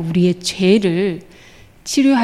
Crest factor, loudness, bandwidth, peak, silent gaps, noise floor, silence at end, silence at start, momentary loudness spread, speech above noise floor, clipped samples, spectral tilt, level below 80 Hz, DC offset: 14 dB; -16 LUFS; 14 kHz; -2 dBFS; none; -44 dBFS; 0 s; 0 s; 13 LU; 29 dB; under 0.1%; -5.5 dB/octave; -52 dBFS; under 0.1%